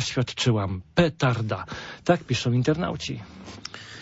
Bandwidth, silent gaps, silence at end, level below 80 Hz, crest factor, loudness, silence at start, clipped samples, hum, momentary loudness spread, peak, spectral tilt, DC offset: 8 kHz; none; 0 s; -50 dBFS; 20 dB; -25 LUFS; 0 s; under 0.1%; none; 15 LU; -6 dBFS; -5.5 dB/octave; under 0.1%